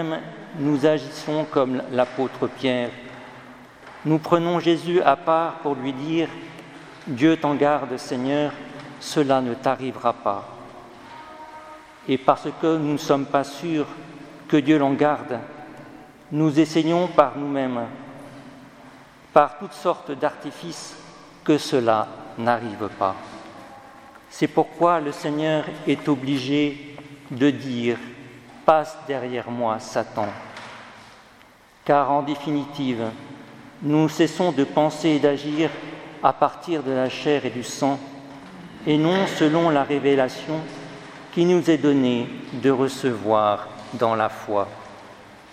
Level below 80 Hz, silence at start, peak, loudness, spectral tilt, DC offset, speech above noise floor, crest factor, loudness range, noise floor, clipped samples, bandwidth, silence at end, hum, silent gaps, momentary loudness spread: -64 dBFS; 0 s; 0 dBFS; -22 LUFS; -6 dB/octave; under 0.1%; 30 dB; 22 dB; 4 LU; -51 dBFS; under 0.1%; 14.5 kHz; 0.1 s; none; none; 21 LU